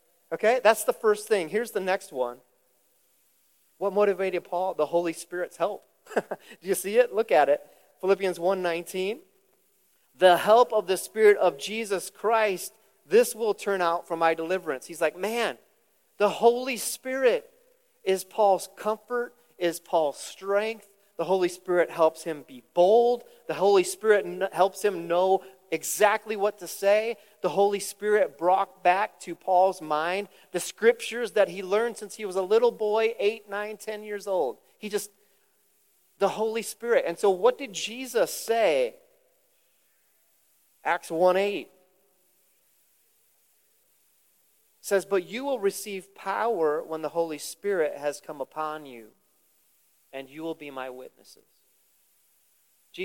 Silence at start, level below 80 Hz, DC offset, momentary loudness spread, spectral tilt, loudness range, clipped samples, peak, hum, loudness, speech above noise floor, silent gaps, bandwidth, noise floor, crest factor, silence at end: 0.3 s; -86 dBFS; under 0.1%; 13 LU; -3.5 dB/octave; 8 LU; under 0.1%; -6 dBFS; none; -26 LUFS; 42 dB; none; 17 kHz; -68 dBFS; 22 dB; 0 s